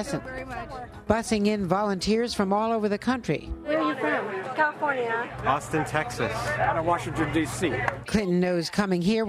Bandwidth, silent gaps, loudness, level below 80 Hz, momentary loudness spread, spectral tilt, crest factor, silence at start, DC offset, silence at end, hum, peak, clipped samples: 15 kHz; none; -26 LUFS; -46 dBFS; 7 LU; -5.5 dB/octave; 20 dB; 0 s; under 0.1%; 0 s; none; -6 dBFS; under 0.1%